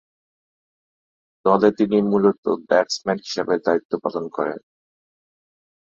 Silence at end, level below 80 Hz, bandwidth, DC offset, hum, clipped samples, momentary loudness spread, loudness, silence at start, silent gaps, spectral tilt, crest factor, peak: 1.25 s; -64 dBFS; 7.8 kHz; under 0.1%; none; under 0.1%; 9 LU; -21 LUFS; 1.45 s; 2.38-2.43 s, 3.85-3.90 s; -5.5 dB/octave; 20 dB; -2 dBFS